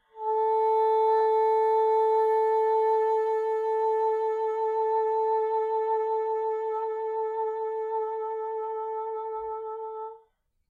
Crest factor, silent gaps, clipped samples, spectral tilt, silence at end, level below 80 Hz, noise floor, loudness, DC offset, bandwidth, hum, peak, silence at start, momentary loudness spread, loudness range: 12 dB; none; under 0.1%; -3.5 dB/octave; 0.5 s; -76 dBFS; -66 dBFS; -26 LUFS; under 0.1%; 4.2 kHz; none; -16 dBFS; 0.15 s; 10 LU; 8 LU